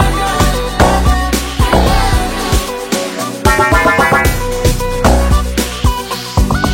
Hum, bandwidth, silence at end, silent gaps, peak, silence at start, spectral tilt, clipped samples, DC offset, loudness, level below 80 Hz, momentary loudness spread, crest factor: none; 17 kHz; 0 s; none; 0 dBFS; 0 s; -4.5 dB/octave; under 0.1%; under 0.1%; -13 LUFS; -16 dBFS; 7 LU; 12 dB